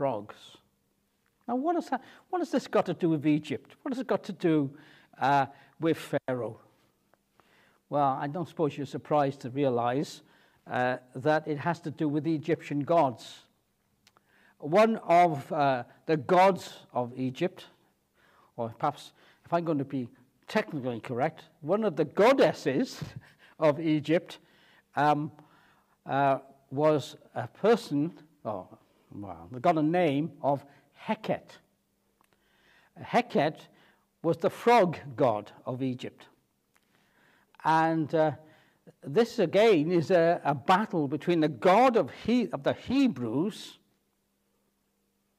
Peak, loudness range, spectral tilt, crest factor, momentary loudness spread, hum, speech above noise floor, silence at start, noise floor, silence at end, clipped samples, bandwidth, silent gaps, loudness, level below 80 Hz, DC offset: -10 dBFS; 7 LU; -6.5 dB/octave; 18 dB; 16 LU; none; 47 dB; 0 s; -75 dBFS; 1.65 s; under 0.1%; 15 kHz; none; -28 LUFS; -74 dBFS; under 0.1%